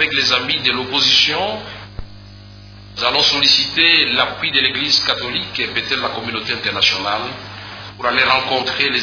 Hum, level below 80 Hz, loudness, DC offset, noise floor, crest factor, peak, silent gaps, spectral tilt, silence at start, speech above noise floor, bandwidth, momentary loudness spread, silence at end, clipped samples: 50 Hz at -40 dBFS; -44 dBFS; -14 LUFS; under 0.1%; -38 dBFS; 18 dB; 0 dBFS; none; -2 dB/octave; 0 s; 21 dB; 5.4 kHz; 18 LU; 0 s; under 0.1%